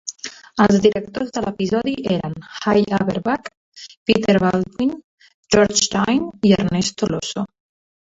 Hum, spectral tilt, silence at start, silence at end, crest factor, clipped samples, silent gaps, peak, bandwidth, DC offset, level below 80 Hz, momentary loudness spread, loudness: none; -4.5 dB/octave; 0.05 s; 0.75 s; 18 dB; under 0.1%; 3.57-3.72 s, 3.97-4.06 s, 5.04-5.18 s, 5.34-5.43 s; 0 dBFS; 8 kHz; under 0.1%; -48 dBFS; 14 LU; -19 LUFS